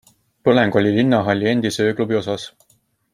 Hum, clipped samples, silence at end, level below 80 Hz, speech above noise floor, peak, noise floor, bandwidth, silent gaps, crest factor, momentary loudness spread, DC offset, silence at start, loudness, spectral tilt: none; under 0.1%; 0.65 s; -58 dBFS; 44 dB; -2 dBFS; -61 dBFS; 15 kHz; none; 16 dB; 10 LU; under 0.1%; 0.45 s; -18 LUFS; -6 dB/octave